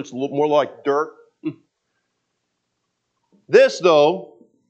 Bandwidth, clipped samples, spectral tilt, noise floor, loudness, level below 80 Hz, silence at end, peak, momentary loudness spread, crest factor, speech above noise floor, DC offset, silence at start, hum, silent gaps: 8.4 kHz; under 0.1%; -5 dB/octave; -75 dBFS; -17 LUFS; -82 dBFS; 0.45 s; 0 dBFS; 17 LU; 20 dB; 58 dB; under 0.1%; 0 s; 60 Hz at -65 dBFS; none